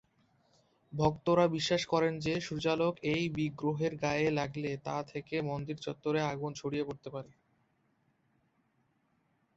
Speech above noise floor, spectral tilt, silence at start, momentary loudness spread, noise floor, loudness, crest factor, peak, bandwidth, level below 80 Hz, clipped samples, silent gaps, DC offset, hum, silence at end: 42 dB; -6 dB/octave; 0.9 s; 10 LU; -75 dBFS; -33 LUFS; 22 dB; -14 dBFS; 8 kHz; -62 dBFS; under 0.1%; none; under 0.1%; none; 2.3 s